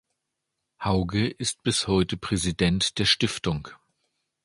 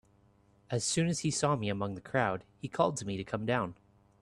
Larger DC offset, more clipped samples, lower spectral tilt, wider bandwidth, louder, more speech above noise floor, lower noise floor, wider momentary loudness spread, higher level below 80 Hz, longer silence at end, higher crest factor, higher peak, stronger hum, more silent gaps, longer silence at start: neither; neither; about the same, -4 dB/octave vs -4.5 dB/octave; about the same, 11.5 kHz vs 12.5 kHz; first, -25 LUFS vs -33 LUFS; first, 57 dB vs 33 dB; first, -82 dBFS vs -65 dBFS; about the same, 8 LU vs 8 LU; first, -44 dBFS vs -64 dBFS; first, 0.7 s vs 0.5 s; about the same, 20 dB vs 20 dB; first, -6 dBFS vs -14 dBFS; neither; neither; about the same, 0.8 s vs 0.7 s